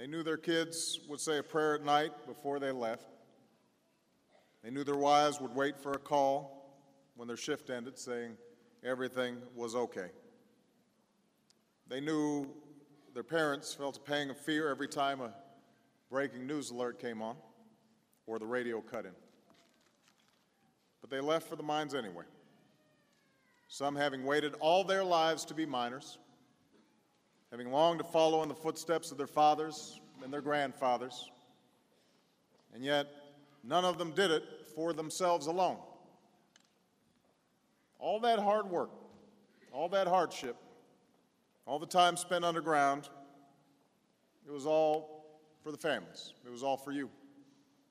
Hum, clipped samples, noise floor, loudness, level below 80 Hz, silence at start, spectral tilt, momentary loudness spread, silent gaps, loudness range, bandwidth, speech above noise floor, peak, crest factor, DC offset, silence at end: none; under 0.1%; -74 dBFS; -35 LUFS; -86 dBFS; 0 s; -3.5 dB/octave; 17 LU; none; 8 LU; 15.5 kHz; 40 dB; -14 dBFS; 22 dB; under 0.1%; 0.5 s